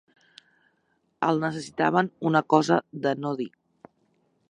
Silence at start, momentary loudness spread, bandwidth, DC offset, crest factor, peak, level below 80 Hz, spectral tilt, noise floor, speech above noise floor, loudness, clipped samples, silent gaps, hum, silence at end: 1.2 s; 9 LU; 10.5 kHz; under 0.1%; 22 dB; -4 dBFS; -72 dBFS; -6 dB/octave; -71 dBFS; 47 dB; -25 LUFS; under 0.1%; none; none; 1 s